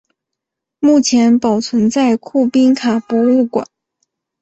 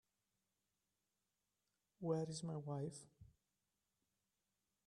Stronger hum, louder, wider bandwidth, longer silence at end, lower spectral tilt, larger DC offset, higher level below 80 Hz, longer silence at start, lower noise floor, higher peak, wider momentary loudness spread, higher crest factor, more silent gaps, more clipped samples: neither; first, -13 LUFS vs -46 LUFS; second, 8.2 kHz vs 11 kHz; second, 0.75 s vs 1.55 s; second, -4.5 dB/octave vs -6.5 dB/octave; neither; first, -56 dBFS vs -82 dBFS; second, 0.8 s vs 2 s; second, -80 dBFS vs under -90 dBFS; first, -2 dBFS vs -28 dBFS; second, 6 LU vs 14 LU; second, 12 dB vs 22 dB; neither; neither